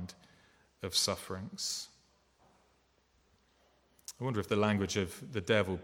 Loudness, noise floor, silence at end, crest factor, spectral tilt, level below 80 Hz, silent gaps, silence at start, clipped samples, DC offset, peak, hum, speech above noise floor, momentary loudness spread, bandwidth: -34 LUFS; -71 dBFS; 0 s; 24 dB; -4 dB/octave; -66 dBFS; none; 0 s; under 0.1%; under 0.1%; -14 dBFS; none; 38 dB; 17 LU; 18 kHz